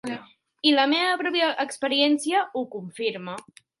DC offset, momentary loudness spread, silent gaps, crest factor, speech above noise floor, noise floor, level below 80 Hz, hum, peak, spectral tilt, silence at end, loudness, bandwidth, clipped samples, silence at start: under 0.1%; 15 LU; none; 18 dB; 19 dB; -43 dBFS; -78 dBFS; none; -6 dBFS; -3 dB/octave; 0.4 s; -23 LUFS; 11.5 kHz; under 0.1%; 0.05 s